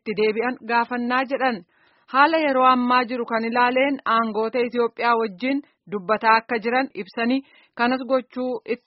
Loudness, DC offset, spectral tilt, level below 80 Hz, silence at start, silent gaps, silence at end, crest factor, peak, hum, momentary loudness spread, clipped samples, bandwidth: -21 LUFS; under 0.1%; -2 dB/octave; -70 dBFS; 0.05 s; none; 0.1 s; 20 dB; -2 dBFS; none; 9 LU; under 0.1%; 5.8 kHz